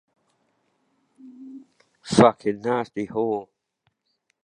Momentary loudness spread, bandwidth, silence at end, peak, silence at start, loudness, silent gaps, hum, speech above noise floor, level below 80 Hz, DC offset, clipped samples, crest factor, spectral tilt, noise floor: 26 LU; 11 kHz; 1 s; 0 dBFS; 1.25 s; -22 LUFS; none; none; 50 dB; -60 dBFS; under 0.1%; under 0.1%; 26 dB; -6 dB/octave; -73 dBFS